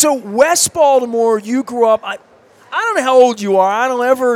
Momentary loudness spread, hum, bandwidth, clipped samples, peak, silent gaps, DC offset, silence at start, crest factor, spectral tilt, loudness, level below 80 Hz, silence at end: 8 LU; none; 16.5 kHz; under 0.1%; 0 dBFS; none; under 0.1%; 0 s; 14 dB; -2.5 dB/octave; -13 LUFS; -60 dBFS; 0 s